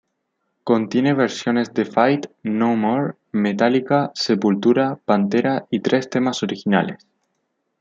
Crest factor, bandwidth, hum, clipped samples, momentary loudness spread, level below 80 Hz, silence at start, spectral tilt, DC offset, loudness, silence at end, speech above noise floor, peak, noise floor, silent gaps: 18 dB; 7.8 kHz; none; under 0.1%; 5 LU; -66 dBFS; 0.65 s; -6 dB/octave; under 0.1%; -20 LUFS; 0.85 s; 54 dB; -2 dBFS; -73 dBFS; none